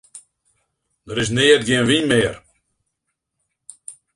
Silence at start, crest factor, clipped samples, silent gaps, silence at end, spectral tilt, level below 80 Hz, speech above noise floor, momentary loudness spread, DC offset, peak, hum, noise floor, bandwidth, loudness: 0.15 s; 20 dB; under 0.1%; none; 0.25 s; -4 dB/octave; -50 dBFS; 61 dB; 23 LU; under 0.1%; 0 dBFS; none; -77 dBFS; 11.5 kHz; -17 LUFS